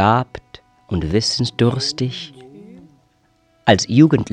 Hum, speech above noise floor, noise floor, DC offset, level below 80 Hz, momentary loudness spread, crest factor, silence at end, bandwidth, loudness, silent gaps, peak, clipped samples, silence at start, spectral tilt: none; 43 dB; -59 dBFS; under 0.1%; -42 dBFS; 18 LU; 18 dB; 0.05 s; 10 kHz; -17 LUFS; none; 0 dBFS; under 0.1%; 0 s; -5.5 dB/octave